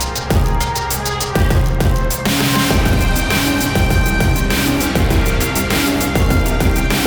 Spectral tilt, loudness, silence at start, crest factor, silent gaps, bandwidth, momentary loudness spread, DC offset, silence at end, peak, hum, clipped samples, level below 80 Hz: -4.5 dB/octave; -16 LUFS; 0 s; 12 dB; none; over 20 kHz; 3 LU; under 0.1%; 0 s; -2 dBFS; none; under 0.1%; -20 dBFS